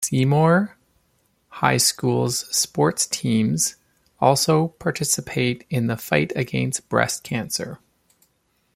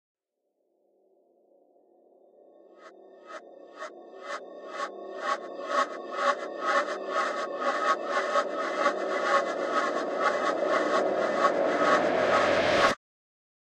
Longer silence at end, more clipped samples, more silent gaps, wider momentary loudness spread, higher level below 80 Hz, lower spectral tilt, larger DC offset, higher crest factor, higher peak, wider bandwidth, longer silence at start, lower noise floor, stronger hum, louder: first, 1 s vs 0.8 s; neither; neither; second, 7 LU vs 16 LU; first, -56 dBFS vs -70 dBFS; about the same, -4 dB/octave vs -3.5 dB/octave; neither; about the same, 20 dB vs 22 dB; first, -2 dBFS vs -8 dBFS; first, 16.5 kHz vs 11 kHz; second, 0 s vs 2.8 s; second, -67 dBFS vs -79 dBFS; neither; first, -21 LUFS vs -27 LUFS